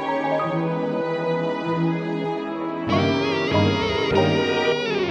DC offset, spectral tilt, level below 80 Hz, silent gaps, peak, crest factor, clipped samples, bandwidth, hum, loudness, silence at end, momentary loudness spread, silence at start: under 0.1%; -6.5 dB/octave; -50 dBFS; none; -4 dBFS; 18 dB; under 0.1%; 8.6 kHz; none; -22 LUFS; 0 s; 6 LU; 0 s